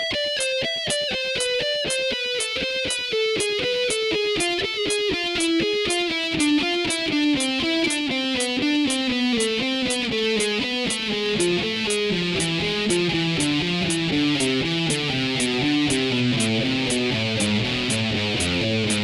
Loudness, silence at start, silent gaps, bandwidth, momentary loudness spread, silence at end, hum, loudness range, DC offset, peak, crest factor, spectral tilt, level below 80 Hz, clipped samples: -22 LUFS; 0 s; none; 13 kHz; 2 LU; 0 s; none; 1 LU; under 0.1%; -6 dBFS; 16 dB; -3.5 dB/octave; -50 dBFS; under 0.1%